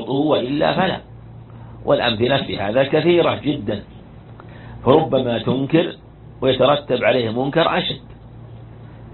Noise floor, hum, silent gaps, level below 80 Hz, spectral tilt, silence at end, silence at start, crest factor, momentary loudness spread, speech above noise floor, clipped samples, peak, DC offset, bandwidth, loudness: -39 dBFS; none; none; -46 dBFS; -10 dB/octave; 0 s; 0 s; 20 dB; 23 LU; 22 dB; under 0.1%; 0 dBFS; under 0.1%; 4.4 kHz; -18 LUFS